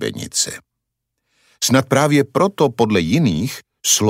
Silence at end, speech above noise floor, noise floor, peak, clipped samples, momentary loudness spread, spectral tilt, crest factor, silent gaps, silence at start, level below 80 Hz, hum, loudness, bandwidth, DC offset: 0 s; 60 dB; -77 dBFS; -2 dBFS; under 0.1%; 8 LU; -4 dB/octave; 16 dB; none; 0 s; -50 dBFS; none; -17 LUFS; 16 kHz; under 0.1%